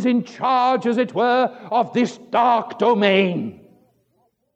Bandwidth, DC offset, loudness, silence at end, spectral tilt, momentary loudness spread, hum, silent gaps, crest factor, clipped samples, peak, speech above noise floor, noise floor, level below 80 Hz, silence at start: 8.4 kHz; under 0.1%; -19 LUFS; 1.05 s; -6 dB/octave; 6 LU; none; none; 18 dB; under 0.1%; -2 dBFS; 47 dB; -66 dBFS; -74 dBFS; 0 s